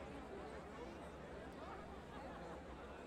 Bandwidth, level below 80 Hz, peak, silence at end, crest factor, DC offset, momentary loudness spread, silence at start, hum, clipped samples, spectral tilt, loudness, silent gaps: 15 kHz; -62 dBFS; -40 dBFS; 0 s; 12 dB; under 0.1%; 2 LU; 0 s; none; under 0.1%; -6 dB/octave; -53 LUFS; none